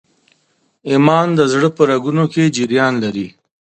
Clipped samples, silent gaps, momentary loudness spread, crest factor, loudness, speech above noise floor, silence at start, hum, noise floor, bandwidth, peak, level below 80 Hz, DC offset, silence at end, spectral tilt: under 0.1%; none; 11 LU; 16 dB; -14 LUFS; 48 dB; 0.85 s; none; -62 dBFS; 9.2 kHz; 0 dBFS; -58 dBFS; under 0.1%; 0.45 s; -6 dB/octave